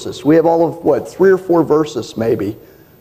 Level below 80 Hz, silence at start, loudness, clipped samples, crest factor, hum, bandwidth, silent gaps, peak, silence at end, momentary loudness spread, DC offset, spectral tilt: -50 dBFS; 0 s; -14 LUFS; under 0.1%; 12 dB; none; 15 kHz; none; -2 dBFS; 0.45 s; 8 LU; under 0.1%; -7 dB/octave